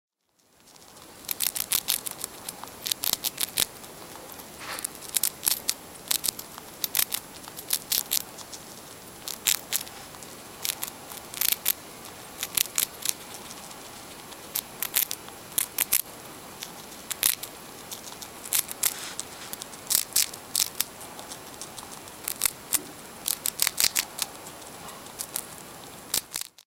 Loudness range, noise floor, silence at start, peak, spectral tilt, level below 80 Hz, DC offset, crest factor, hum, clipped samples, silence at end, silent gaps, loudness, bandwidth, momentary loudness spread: 2 LU; -66 dBFS; 0.65 s; 0 dBFS; 0.5 dB/octave; -62 dBFS; under 0.1%; 32 dB; none; under 0.1%; 0.15 s; none; -27 LUFS; 17 kHz; 17 LU